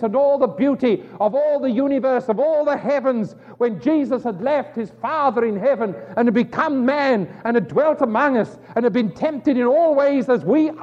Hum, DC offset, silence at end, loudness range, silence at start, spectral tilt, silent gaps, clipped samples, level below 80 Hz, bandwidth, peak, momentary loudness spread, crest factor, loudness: none; under 0.1%; 0 s; 2 LU; 0 s; -8 dB/octave; none; under 0.1%; -64 dBFS; 7.6 kHz; -4 dBFS; 6 LU; 14 dB; -19 LUFS